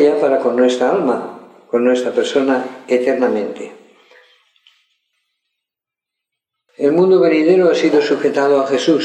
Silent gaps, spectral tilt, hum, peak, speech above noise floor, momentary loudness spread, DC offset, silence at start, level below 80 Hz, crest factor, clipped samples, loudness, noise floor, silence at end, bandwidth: none; -5.5 dB/octave; none; -2 dBFS; 72 dB; 10 LU; under 0.1%; 0 s; -74 dBFS; 14 dB; under 0.1%; -15 LUFS; -85 dBFS; 0 s; 9.4 kHz